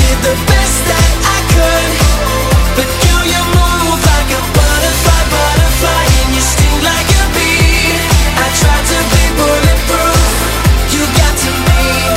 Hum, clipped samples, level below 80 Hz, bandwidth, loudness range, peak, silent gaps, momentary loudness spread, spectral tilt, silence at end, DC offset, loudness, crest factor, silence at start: none; under 0.1%; -14 dBFS; 16.5 kHz; 1 LU; 0 dBFS; none; 2 LU; -3.5 dB/octave; 0 s; under 0.1%; -10 LUFS; 10 dB; 0 s